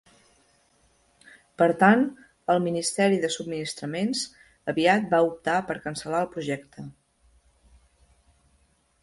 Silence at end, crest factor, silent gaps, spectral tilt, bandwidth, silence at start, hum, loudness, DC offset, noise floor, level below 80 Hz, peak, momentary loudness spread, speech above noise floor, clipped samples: 2.1 s; 22 dB; none; -4.5 dB/octave; 11.5 kHz; 1.6 s; none; -25 LUFS; under 0.1%; -66 dBFS; -64 dBFS; -6 dBFS; 15 LU; 41 dB; under 0.1%